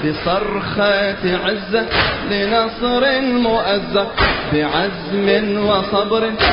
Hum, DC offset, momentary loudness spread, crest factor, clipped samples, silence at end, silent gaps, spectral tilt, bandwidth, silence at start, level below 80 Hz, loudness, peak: none; under 0.1%; 4 LU; 16 dB; under 0.1%; 0 s; none; -9.5 dB/octave; 5.4 kHz; 0 s; -36 dBFS; -17 LUFS; -2 dBFS